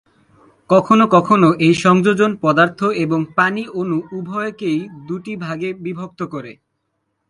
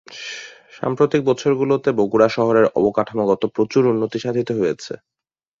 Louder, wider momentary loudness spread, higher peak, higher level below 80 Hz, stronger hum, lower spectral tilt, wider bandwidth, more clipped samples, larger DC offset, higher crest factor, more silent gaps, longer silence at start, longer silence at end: about the same, -16 LUFS vs -18 LUFS; about the same, 15 LU vs 15 LU; about the same, 0 dBFS vs -2 dBFS; about the same, -60 dBFS vs -58 dBFS; neither; about the same, -6.5 dB/octave vs -6.5 dB/octave; first, 11.5 kHz vs 7.6 kHz; neither; neither; about the same, 16 dB vs 18 dB; neither; first, 0.7 s vs 0.1 s; about the same, 0.75 s vs 0.65 s